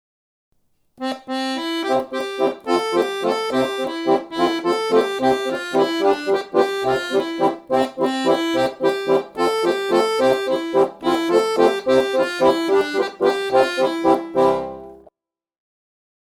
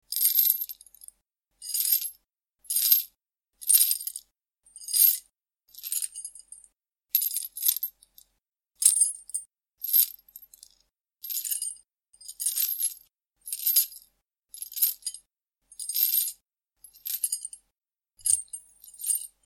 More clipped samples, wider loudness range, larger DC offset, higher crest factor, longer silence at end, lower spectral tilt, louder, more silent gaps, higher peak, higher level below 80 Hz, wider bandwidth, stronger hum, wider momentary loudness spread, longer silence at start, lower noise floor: neither; second, 3 LU vs 6 LU; neither; second, 18 dB vs 28 dB; first, 1.45 s vs 0.2 s; first, -4.5 dB/octave vs 6 dB/octave; first, -19 LUFS vs -25 LUFS; neither; about the same, -2 dBFS vs -2 dBFS; first, -58 dBFS vs -76 dBFS; about the same, 15.5 kHz vs 16.5 kHz; neither; second, 5 LU vs 21 LU; first, 1 s vs 0.1 s; second, -66 dBFS vs -85 dBFS